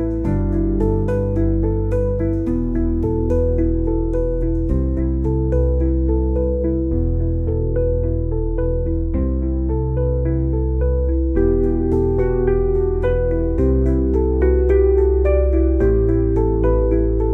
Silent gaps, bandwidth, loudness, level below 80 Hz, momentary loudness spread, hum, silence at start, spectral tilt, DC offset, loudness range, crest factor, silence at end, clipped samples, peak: none; 2.6 kHz; -19 LUFS; -20 dBFS; 4 LU; none; 0 s; -12 dB/octave; 0.2%; 4 LU; 12 dB; 0 s; under 0.1%; -4 dBFS